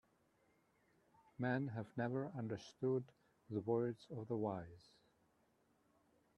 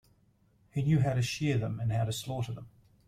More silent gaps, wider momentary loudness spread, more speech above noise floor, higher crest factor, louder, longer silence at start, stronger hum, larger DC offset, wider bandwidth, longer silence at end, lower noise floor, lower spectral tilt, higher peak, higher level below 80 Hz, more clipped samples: neither; about the same, 10 LU vs 11 LU; about the same, 35 dB vs 37 dB; about the same, 20 dB vs 16 dB; second, -43 LUFS vs -31 LUFS; first, 1.4 s vs 0.75 s; neither; neither; second, 10.5 kHz vs 15 kHz; first, 1.6 s vs 0.4 s; first, -78 dBFS vs -67 dBFS; first, -8 dB/octave vs -6 dB/octave; second, -26 dBFS vs -16 dBFS; second, -82 dBFS vs -56 dBFS; neither